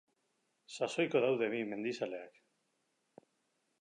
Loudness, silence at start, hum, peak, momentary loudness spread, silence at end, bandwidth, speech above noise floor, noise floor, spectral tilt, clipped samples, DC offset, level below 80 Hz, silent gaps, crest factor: -35 LUFS; 0.7 s; none; -18 dBFS; 17 LU; 1.5 s; 11 kHz; 45 dB; -81 dBFS; -5 dB/octave; under 0.1%; under 0.1%; under -90 dBFS; none; 20 dB